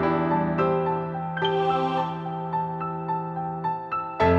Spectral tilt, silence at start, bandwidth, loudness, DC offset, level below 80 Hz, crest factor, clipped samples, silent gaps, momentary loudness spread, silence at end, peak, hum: -8 dB/octave; 0 s; 6.8 kHz; -26 LUFS; under 0.1%; -50 dBFS; 16 dB; under 0.1%; none; 7 LU; 0 s; -8 dBFS; none